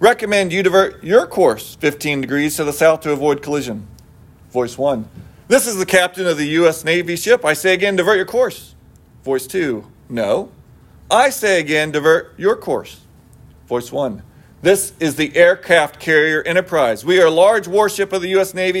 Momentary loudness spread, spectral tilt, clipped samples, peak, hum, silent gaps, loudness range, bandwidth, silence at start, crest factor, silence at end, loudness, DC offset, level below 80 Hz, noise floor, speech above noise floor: 10 LU; -4 dB/octave; under 0.1%; 0 dBFS; none; none; 5 LU; 16.5 kHz; 0 s; 16 dB; 0 s; -16 LUFS; under 0.1%; -52 dBFS; -46 dBFS; 30 dB